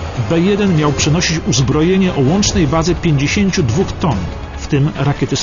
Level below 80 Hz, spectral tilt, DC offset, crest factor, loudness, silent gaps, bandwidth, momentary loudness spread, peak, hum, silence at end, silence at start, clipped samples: -28 dBFS; -5 dB/octave; under 0.1%; 12 dB; -14 LUFS; none; 7.4 kHz; 5 LU; -2 dBFS; none; 0 s; 0 s; under 0.1%